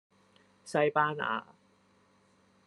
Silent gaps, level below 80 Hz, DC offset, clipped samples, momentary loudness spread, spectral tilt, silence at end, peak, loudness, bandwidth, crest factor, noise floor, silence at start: none; -82 dBFS; under 0.1%; under 0.1%; 10 LU; -5 dB/octave; 1.25 s; -12 dBFS; -31 LUFS; 11.5 kHz; 24 dB; -67 dBFS; 0.65 s